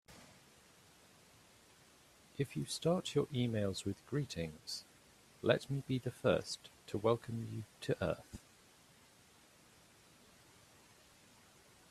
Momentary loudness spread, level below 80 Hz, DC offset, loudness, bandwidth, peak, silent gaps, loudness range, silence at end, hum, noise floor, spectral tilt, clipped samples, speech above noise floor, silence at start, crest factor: 16 LU; -70 dBFS; under 0.1%; -39 LUFS; 14.5 kHz; -14 dBFS; none; 8 LU; 3.5 s; none; -65 dBFS; -5.5 dB/octave; under 0.1%; 27 dB; 0.1 s; 26 dB